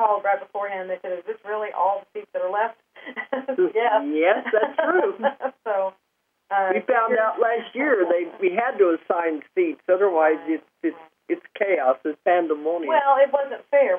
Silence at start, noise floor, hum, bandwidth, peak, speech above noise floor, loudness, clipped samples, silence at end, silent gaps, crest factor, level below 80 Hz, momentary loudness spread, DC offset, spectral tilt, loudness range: 0 s; -73 dBFS; none; 3.6 kHz; -6 dBFS; 51 dB; -23 LUFS; under 0.1%; 0 s; none; 16 dB; -88 dBFS; 10 LU; under 0.1%; -7.5 dB/octave; 3 LU